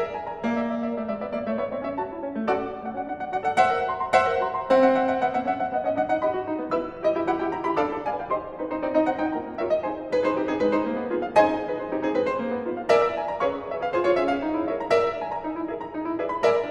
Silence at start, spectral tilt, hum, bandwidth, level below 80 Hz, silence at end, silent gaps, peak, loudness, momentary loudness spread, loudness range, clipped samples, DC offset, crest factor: 0 s; -6 dB/octave; none; 10.5 kHz; -56 dBFS; 0 s; none; -6 dBFS; -25 LUFS; 9 LU; 3 LU; under 0.1%; under 0.1%; 20 dB